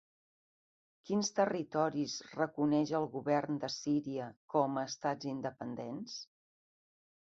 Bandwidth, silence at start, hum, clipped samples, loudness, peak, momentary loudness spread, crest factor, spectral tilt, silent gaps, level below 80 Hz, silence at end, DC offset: 7.6 kHz; 1.05 s; none; under 0.1%; -36 LUFS; -18 dBFS; 11 LU; 20 dB; -5 dB/octave; 4.36-4.48 s; -78 dBFS; 1.05 s; under 0.1%